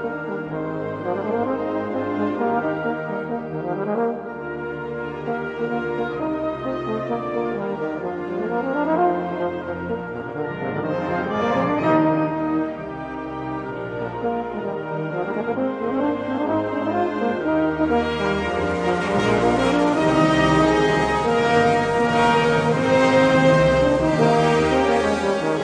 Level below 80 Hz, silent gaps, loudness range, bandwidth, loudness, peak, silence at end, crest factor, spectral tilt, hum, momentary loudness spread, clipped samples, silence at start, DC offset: -44 dBFS; none; 9 LU; 10.5 kHz; -21 LUFS; -4 dBFS; 0 s; 16 dB; -6.5 dB/octave; none; 11 LU; under 0.1%; 0 s; under 0.1%